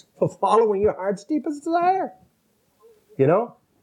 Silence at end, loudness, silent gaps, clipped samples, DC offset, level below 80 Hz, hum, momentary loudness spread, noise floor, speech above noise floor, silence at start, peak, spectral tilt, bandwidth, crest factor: 0.3 s; -22 LUFS; none; under 0.1%; under 0.1%; -58 dBFS; none; 11 LU; -66 dBFS; 45 dB; 0.2 s; -4 dBFS; -7.5 dB/octave; 10.5 kHz; 18 dB